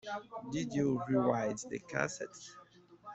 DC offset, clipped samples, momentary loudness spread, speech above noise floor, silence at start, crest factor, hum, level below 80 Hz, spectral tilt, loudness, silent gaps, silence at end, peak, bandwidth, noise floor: under 0.1%; under 0.1%; 17 LU; 20 dB; 0.05 s; 22 dB; none; -70 dBFS; -5.5 dB/octave; -36 LUFS; none; 0 s; -14 dBFS; 8.2 kHz; -56 dBFS